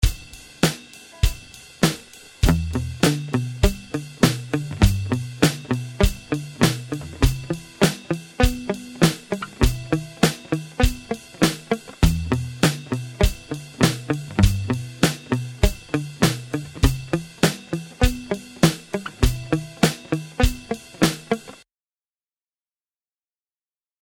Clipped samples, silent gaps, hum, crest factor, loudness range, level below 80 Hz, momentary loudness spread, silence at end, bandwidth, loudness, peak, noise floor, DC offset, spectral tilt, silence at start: under 0.1%; none; none; 22 dB; 2 LU; -28 dBFS; 10 LU; 2.5 s; 17.5 kHz; -23 LUFS; -2 dBFS; under -90 dBFS; under 0.1%; -5 dB/octave; 0 s